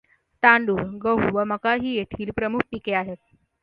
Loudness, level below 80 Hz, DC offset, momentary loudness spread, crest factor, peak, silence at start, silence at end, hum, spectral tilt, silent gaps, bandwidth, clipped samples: -22 LUFS; -52 dBFS; under 0.1%; 11 LU; 24 dB; 0 dBFS; 0.4 s; 0.5 s; none; -8.5 dB/octave; none; 5.4 kHz; under 0.1%